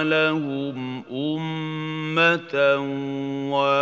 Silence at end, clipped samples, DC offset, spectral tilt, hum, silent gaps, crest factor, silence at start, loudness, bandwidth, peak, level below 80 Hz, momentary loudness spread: 0 s; under 0.1%; under 0.1%; -6.5 dB/octave; none; none; 18 dB; 0 s; -23 LUFS; 7.8 kHz; -6 dBFS; -72 dBFS; 9 LU